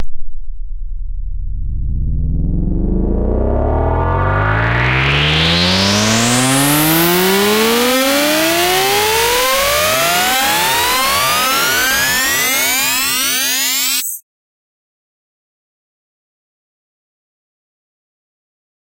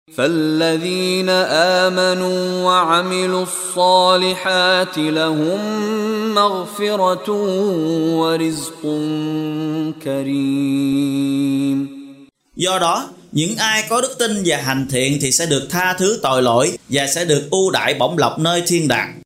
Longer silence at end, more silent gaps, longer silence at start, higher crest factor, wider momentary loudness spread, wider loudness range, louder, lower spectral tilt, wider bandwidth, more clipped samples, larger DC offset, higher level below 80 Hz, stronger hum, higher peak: first, 4.8 s vs 0.05 s; neither; about the same, 0 s vs 0.1 s; about the same, 12 dB vs 16 dB; first, 12 LU vs 7 LU; first, 8 LU vs 4 LU; first, -13 LUFS vs -17 LUFS; about the same, -3 dB/octave vs -3.5 dB/octave; about the same, 16 kHz vs 16 kHz; neither; neither; first, -24 dBFS vs -56 dBFS; neither; about the same, -2 dBFS vs -2 dBFS